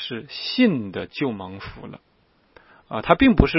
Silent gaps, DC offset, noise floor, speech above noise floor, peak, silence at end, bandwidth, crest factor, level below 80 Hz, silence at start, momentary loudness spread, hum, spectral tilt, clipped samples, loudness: none; under 0.1%; -56 dBFS; 35 dB; 0 dBFS; 0 s; 5.8 kHz; 22 dB; -34 dBFS; 0 s; 21 LU; none; -9.5 dB/octave; under 0.1%; -22 LUFS